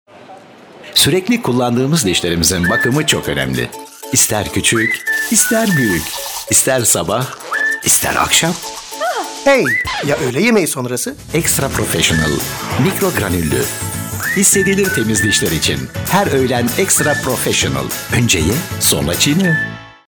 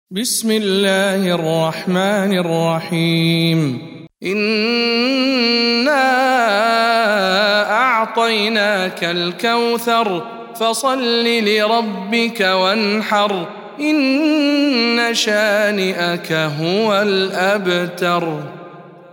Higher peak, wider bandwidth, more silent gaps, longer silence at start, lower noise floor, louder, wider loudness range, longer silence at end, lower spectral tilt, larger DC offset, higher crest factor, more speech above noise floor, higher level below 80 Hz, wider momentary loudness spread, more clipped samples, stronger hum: about the same, -2 dBFS vs -2 dBFS; first, over 20 kHz vs 17.5 kHz; neither; about the same, 0.15 s vs 0.1 s; about the same, -38 dBFS vs -37 dBFS; about the same, -14 LUFS vs -16 LUFS; about the same, 2 LU vs 3 LU; about the same, 0.15 s vs 0.1 s; second, -3 dB/octave vs -4.5 dB/octave; neither; about the same, 12 dB vs 14 dB; about the same, 24 dB vs 21 dB; first, -38 dBFS vs -68 dBFS; first, 8 LU vs 5 LU; neither; neither